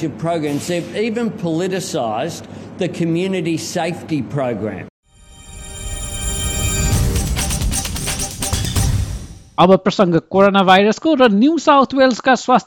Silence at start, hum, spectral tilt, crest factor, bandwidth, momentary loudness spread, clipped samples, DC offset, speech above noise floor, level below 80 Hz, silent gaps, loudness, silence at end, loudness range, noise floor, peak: 0 s; none; -4.5 dB/octave; 16 dB; 17.5 kHz; 14 LU; under 0.1%; under 0.1%; 26 dB; -30 dBFS; 4.90-5.03 s; -17 LUFS; 0 s; 9 LU; -41 dBFS; 0 dBFS